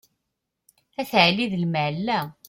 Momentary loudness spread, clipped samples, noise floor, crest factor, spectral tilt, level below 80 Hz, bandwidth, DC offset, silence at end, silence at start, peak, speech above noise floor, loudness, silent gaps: 12 LU; under 0.1%; -81 dBFS; 22 dB; -5.5 dB/octave; -62 dBFS; 16.5 kHz; under 0.1%; 0.15 s; 1 s; -4 dBFS; 58 dB; -22 LUFS; none